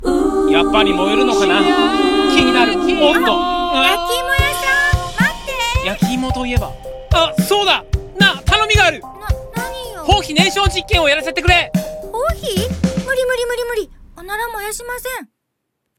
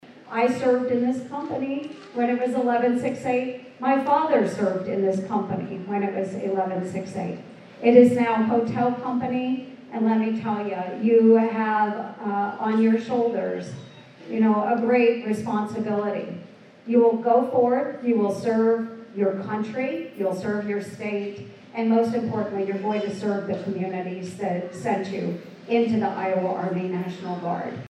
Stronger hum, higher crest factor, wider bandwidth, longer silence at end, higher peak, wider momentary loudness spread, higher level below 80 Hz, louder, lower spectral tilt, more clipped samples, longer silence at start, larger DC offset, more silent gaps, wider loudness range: neither; second, 16 dB vs 22 dB; first, 17.5 kHz vs 10.5 kHz; first, 0.75 s vs 0 s; about the same, 0 dBFS vs -2 dBFS; about the same, 12 LU vs 11 LU; first, -28 dBFS vs -74 dBFS; first, -15 LUFS vs -24 LUFS; second, -4.5 dB/octave vs -7.5 dB/octave; neither; about the same, 0 s vs 0.05 s; neither; neither; about the same, 7 LU vs 5 LU